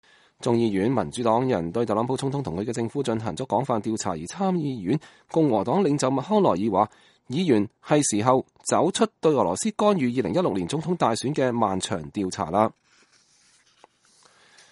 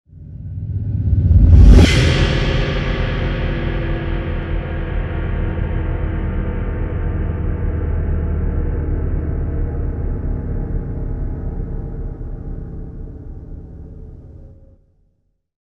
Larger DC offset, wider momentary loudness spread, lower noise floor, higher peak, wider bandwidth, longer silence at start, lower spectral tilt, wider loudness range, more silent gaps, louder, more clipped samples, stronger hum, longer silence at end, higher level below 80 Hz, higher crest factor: neither; second, 7 LU vs 21 LU; second, -60 dBFS vs -64 dBFS; second, -4 dBFS vs 0 dBFS; first, 11.5 kHz vs 10 kHz; first, 0.4 s vs 0.15 s; second, -5.5 dB/octave vs -7 dB/octave; second, 4 LU vs 16 LU; neither; second, -24 LUFS vs -19 LUFS; neither; neither; first, 2 s vs 1.1 s; second, -60 dBFS vs -20 dBFS; about the same, 22 dB vs 18 dB